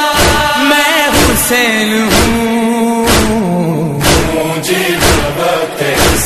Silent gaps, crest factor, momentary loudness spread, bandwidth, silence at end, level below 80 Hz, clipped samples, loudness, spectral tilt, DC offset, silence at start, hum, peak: none; 10 dB; 5 LU; 14 kHz; 0 s; -24 dBFS; 0.1%; -10 LUFS; -3.5 dB/octave; under 0.1%; 0 s; none; 0 dBFS